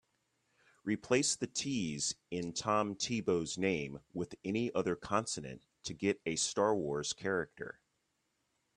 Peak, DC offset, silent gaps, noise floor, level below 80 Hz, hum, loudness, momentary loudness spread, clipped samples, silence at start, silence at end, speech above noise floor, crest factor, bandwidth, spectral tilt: -14 dBFS; under 0.1%; none; -81 dBFS; -68 dBFS; none; -35 LUFS; 12 LU; under 0.1%; 0.85 s; 1.05 s; 46 dB; 22 dB; 11.5 kHz; -3.5 dB/octave